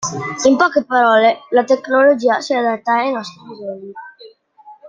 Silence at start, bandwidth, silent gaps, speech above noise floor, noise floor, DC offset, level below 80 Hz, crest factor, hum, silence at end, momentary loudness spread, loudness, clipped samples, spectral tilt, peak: 0 s; 9.2 kHz; none; 29 dB; -44 dBFS; under 0.1%; -62 dBFS; 14 dB; none; 0 s; 19 LU; -15 LUFS; under 0.1%; -4 dB/octave; -2 dBFS